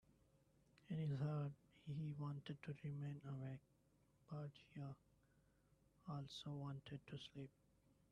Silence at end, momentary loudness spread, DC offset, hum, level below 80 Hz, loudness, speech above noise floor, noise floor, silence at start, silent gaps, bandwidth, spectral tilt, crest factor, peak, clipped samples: 0.6 s; 12 LU; under 0.1%; none; -80 dBFS; -52 LUFS; 28 dB; -78 dBFS; 0.85 s; none; 9.8 kHz; -7.5 dB/octave; 18 dB; -34 dBFS; under 0.1%